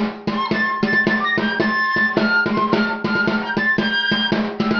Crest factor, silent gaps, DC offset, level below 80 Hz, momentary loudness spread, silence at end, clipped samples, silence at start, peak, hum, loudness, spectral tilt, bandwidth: 16 dB; none; under 0.1%; -52 dBFS; 3 LU; 0 s; under 0.1%; 0 s; -2 dBFS; none; -18 LUFS; -6 dB/octave; 6.8 kHz